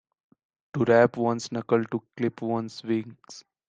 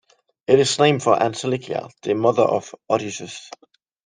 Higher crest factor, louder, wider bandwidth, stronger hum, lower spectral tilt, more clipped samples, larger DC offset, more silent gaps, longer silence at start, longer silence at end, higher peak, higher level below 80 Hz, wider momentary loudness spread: about the same, 20 dB vs 18 dB; second, -26 LUFS vs -20 LUFS; second, 9 kHz vs 10 kHz; neither; first, -6.5 dB/octave vs -4.5 dB/octave; neither; neither; neither; first, 0.75 s vs 0.5 s; second, 0.3 s vs 0.6 s; second, -6 dBFS vs -2 dBFS; second, -70 dBFS vs -64 dBFS; first, 18 LU vs 15 LU